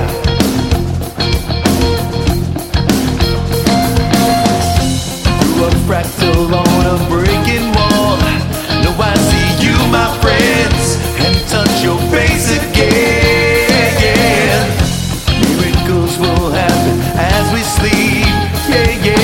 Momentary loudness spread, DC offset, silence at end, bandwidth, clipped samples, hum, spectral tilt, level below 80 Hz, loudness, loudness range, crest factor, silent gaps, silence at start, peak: 5 LU; 0.3%; 0 s; 17 kHz; under 0.1%; none; -5 dB/octave; -22 dBFS; -12 LUFS; 2 LU; 12 dB; none; 0 s; 0 dBFS